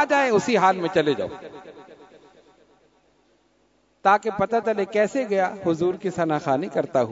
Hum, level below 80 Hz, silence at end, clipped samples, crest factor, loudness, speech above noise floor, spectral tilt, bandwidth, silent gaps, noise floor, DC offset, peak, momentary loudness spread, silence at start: none; -62 dBFS; 0 s; under 0.1%; 20 dB; -22 LUFS; 42 dB; -5.5 dB/octave; 8 kHz; none; -64 dBFS; under 0.1%; -4 dBFS; 7 LU; 0 s